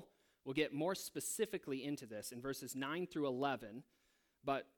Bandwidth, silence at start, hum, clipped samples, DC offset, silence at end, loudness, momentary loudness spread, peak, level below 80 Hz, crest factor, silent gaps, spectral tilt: 19 kHz; 0 s; none; under 0.1%; under 0.1%; 0.15 s; -42 LUFS; 9 LU; -24 dBFS; -76 dBFS; 20 dB; none; -4 dB/octave